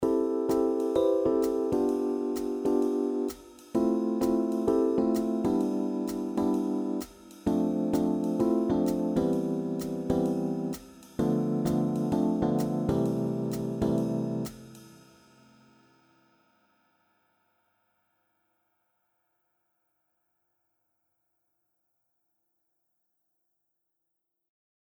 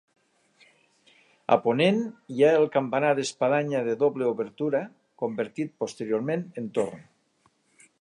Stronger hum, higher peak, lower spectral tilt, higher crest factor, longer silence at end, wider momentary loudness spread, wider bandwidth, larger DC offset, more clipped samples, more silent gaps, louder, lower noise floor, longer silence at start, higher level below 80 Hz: neither; second, -12 dBFS vs -6 dBFS; first, -8 dB/octave vs -5.5 dB/octave; about the same, 18 dB vs 22 dB; first, 9.95 s vs 1 s; second, 7 LU vs 11 LU; first, over 20 kHz vs 11 kHz; neither; neither; neither; about the same, -28 LUFS vs -26 LUFS; first, -83 dBFS vs -67 dBFS; second, 0 s vs 1.5 s; first, -56 dBFS vs -76 dBFS